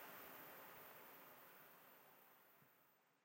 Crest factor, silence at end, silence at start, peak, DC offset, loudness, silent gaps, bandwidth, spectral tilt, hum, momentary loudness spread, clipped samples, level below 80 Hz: 16 dB; 0 s; 0 s; -46 dBFS; under 0.1%; -61 LUFS; none; 16 kHz; -2.5 dB/octave; none; 11 LU; under 0.1%; under -90 dBFS